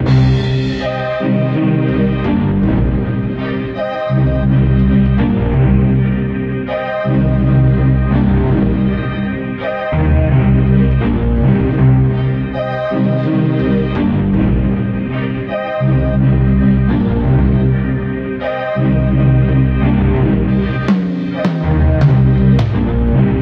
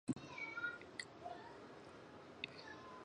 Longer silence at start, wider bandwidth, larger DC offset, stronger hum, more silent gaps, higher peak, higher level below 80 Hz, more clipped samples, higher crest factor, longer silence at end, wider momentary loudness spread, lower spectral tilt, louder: about the same, 0 s vs 0.05 s; second, 5.2 kHz vs 10 kHz; neither; neither; neither; first, 0 dBFS vs -26 dBFS; first, -22 dBFS vs -78 dBFS; neither; second, 12 dB vs 24 dB; about the same, 0 s vs 0 s; second, 7 LU vs 12 LU; first, -10 dB/octave vs -4.5 dB/octave; first, -14 LUFS vs -50 LUFS